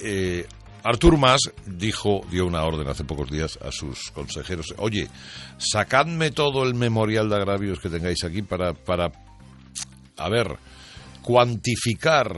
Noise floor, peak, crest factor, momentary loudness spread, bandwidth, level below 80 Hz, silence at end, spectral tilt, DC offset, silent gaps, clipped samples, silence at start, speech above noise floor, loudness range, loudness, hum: -43 dBFS; -4 dBFS; 20 dB; 15 LU; 11.5 kHz; -38 dBFS; 0 s; -4.5 dB/octave; under 0.1%; none; under 0.1%; 0 s; 20 dB; 6 LU; -23 LUFS; none